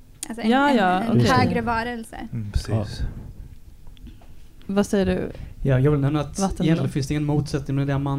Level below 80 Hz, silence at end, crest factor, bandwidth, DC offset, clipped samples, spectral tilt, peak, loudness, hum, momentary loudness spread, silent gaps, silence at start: -36 dBFS; 0 s; 18 dB; 15 kHz; under 0.1%; under 0.1%; -6.5 dB/octave; -6 dBFS; -22 LUFS; none; 15 LU; none; 0 s